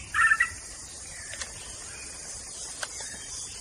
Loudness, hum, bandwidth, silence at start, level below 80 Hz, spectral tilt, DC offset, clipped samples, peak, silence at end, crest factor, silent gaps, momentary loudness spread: -30 LUFS; none; 15 kHz; 0 s; -54 dBFS; 0 dB/octave; under 0.1%; under 0.1%; -10 dBFS; 0 s; 22 dB; none; 17 LU